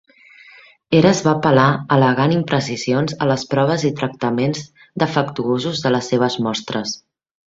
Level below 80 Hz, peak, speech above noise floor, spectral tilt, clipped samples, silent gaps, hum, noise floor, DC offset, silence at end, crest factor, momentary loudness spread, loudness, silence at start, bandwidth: -54 dBFS; 0 dBFS; 29 dB; -5.5 dB/octave; under 0.1%; none; none; -46 dBFS; under 0.1%; 0.6 s; 18 dB; 9 LU; -18 LUFS; 0.9 s; 7.8 kHz